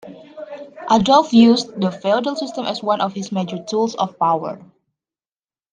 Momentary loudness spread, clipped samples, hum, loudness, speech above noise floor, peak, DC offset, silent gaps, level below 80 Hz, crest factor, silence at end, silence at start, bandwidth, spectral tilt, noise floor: 22 LU; under 0.1%; none; -18 LUFS; over 73 dB; 0 dBFS; under 0.1%; none; -56 dBFS; 18 dB; 1.15 s; 0.05 s; 9.2 kHz; -5.5 dB/octave; under -90 dBFS